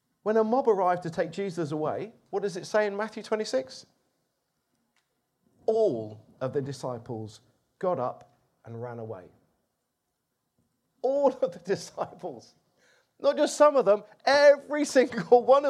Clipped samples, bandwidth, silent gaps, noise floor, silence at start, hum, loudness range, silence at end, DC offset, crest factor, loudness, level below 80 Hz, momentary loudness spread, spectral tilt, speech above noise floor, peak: under 0.1%; 12.5 kHz; none; -80 dBFS; 0.25 s; none; 13 LU; 0 s; under 0.1%; 22 dB; -27 LUFS; -76 dBFS; 19 LU; -5 dB/octave; 54 dB; -6 dBFS